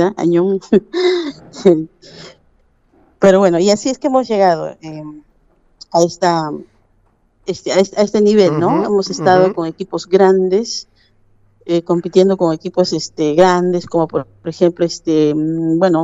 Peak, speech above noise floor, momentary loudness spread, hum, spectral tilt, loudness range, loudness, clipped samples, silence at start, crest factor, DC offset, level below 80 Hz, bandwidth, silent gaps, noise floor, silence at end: 0 dBFS; 42 dB; 14 LU; none; -6 dB/octave; 4 LU; -14 LUFS; under 0.1%; 0 s; 14 dB; under 0.1%; -54 dBFS; 8 kHz; none; -56 dBFS; 0 s